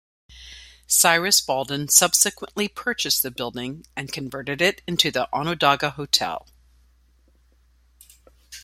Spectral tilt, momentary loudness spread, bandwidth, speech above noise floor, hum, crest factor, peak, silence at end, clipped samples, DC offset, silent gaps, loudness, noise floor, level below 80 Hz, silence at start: -1.5 dB/octave; 16 LU; 16.5 kHz; 36 dB; none; 24 dB; 0 dBFS; 0.05 s; under 0.1%; under 0.1%; none; -20 LUFS; -59 dBFS; -56 dBFS; 0.3 s